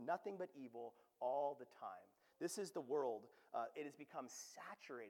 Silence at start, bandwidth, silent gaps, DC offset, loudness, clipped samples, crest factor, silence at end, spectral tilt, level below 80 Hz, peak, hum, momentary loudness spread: 0 s; 19 kHz; none; under 0.1%; -49 LUFS; under 0.1%; 18 dB; 0 s; -4 dB/octave; under -90 dBFS; -30 dBFS; none; 11 LU